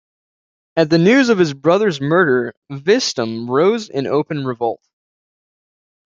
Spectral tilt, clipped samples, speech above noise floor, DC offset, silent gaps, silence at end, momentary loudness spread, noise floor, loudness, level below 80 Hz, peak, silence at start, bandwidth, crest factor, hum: -5.5 dB/octave; under 0.1%; over 74 dB; under 0.1%; 2.57-2.62 s; 1.45 s; 11 LU; under -90 dBFS; -16 LUFS; -62 dBFS; -2 dBFS; 0.75 s; 7.6 kHz; 16 dB; none